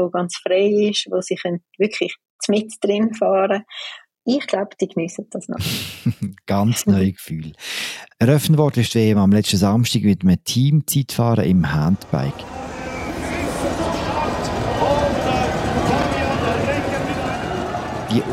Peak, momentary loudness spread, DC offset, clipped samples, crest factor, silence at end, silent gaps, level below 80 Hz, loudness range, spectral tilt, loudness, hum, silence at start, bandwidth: -2 dBFS; 11 LU; under 0.1%; under 0.1%; 16 dB; 0 s; 2.30-2.39 s; -40 dBFS; 6 LU; -5.5 dB/octave; -20 LUFS; none; 0 s; 16.5 kHz